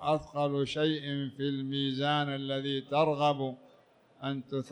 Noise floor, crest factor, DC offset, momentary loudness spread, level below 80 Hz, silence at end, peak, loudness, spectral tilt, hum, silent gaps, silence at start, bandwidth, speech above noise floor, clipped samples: -62 dBFS; 16 dB; under 0.1%; 9 LU; -68 dBFS; 0 s; -14 dBFS; -32 LUFS; -6.5 dB/octave; none; none; 0 s; 9.8 kHz; 31 dB; under 0.1%